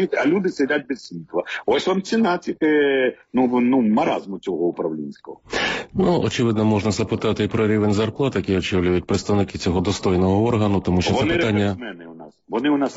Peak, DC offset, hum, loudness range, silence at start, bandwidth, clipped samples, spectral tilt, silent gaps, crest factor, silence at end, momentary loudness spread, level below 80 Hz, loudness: -8 dBFS; under 0.1%; none; 2 LU; 0 s; 8 kHz; under 0.1%; -5.5 dB/octave; none; 12 dB; 0 s; 9 LU; -46 dBFS; -21 LUFS